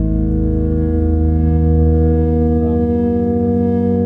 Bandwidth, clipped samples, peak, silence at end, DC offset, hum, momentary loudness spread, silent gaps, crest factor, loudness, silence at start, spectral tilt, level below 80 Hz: 2.3 kHz; under 0.1%; -4 dBFS; 0 s; under 0.1%; none; 3 LU; none; 8 dB; -15 LUFS; 0 s; -13 dB/octave; -20 dBFS